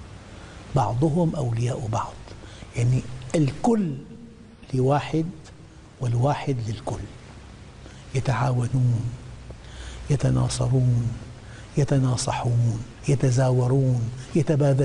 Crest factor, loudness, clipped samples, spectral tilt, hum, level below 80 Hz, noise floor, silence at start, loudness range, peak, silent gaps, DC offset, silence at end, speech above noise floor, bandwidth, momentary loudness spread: 14 dB; -24 LUFS; under 0.1%; -7 dB/octave; none; -44 dBFS; -44 dBFS; 0 s; 5 LU; -10 dBFS; none; under 0.1%; 0 s; 22 dB; 10.5 kHz; 21 LU